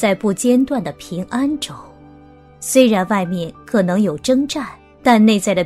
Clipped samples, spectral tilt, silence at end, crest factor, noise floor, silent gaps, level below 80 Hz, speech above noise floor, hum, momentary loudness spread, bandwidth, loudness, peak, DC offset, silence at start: under 0.1%; -5 dB/octave; 0 s; 16 dB; -43 dBFS; none; -50 dBFS; 27 dB; none; 14 LU; 14.5 kHz; -17 LUFS; 0 dBFS; under 0.1%; 0 s